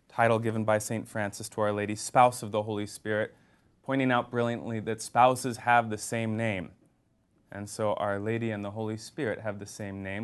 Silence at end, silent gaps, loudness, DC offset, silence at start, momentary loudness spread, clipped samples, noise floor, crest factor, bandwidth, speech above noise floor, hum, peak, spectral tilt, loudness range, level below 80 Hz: 0 s; none; -29 LUFS; under 0.1%; 0.15 s; 14 LU; under 0.1%; -69 dBFS; 22 dB; 12.5 kHz; 40 dB; none; -8 dBFS; -5 dB/octave; 6 LU; -62 dBFS